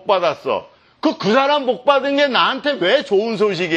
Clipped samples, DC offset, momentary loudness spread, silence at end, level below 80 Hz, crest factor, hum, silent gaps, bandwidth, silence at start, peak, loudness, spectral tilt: under 0.1%; under 0.1%; 7 LU; 0 s; -66 dBFS; 16 dB; none; none; 8.6 kHz; 0.05 s; 0 dBFS; -17 LUFS; -5 dB/octave